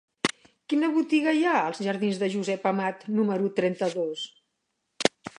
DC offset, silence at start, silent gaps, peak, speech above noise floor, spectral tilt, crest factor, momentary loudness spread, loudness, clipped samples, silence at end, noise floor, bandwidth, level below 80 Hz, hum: under 0.1%; 0.25 s; none; -2 dBFS; 53 dB; -5 dB/octave; 26 dB; 7 LU; -26 LUFS; under 0.1%; 0.1 s; -78 dBFS; 11 kHz; -76 dBFS; none